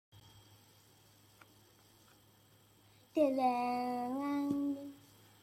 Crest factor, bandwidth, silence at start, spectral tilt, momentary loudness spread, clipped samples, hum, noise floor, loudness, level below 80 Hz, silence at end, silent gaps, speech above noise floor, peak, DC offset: 20 dB; 16 kHz; 0.15 s; -6 dB/octave; 13 LU; under 0.1%; none; -66 dBFS; -36 LUFS; -80 dBFS; 0.45 s; none; 32 dB; -20 dBFS; under 0.1%